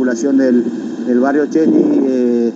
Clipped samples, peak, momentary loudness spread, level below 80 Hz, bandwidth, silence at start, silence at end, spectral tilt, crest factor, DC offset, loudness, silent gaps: under 0.1%; 0 dBFS; 5 LU; -72 dBFS; 7.8 kHz; 0 s; 0 s; -6.5 dB/octave; 12 dB; under 0.1%; -14 LUFS; none